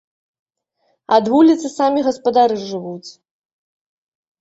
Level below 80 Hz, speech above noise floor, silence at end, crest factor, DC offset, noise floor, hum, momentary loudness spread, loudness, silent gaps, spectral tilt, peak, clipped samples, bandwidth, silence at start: -62 dBFS; 51 dB; 1.3 s; 18 dB; under 0.1%; -66 dBFS; none; 15 LU; -16 LUFS; none; -5.5 dB/octave; -2 dBFS; under 0.1%; 8 kHz; 1.1 s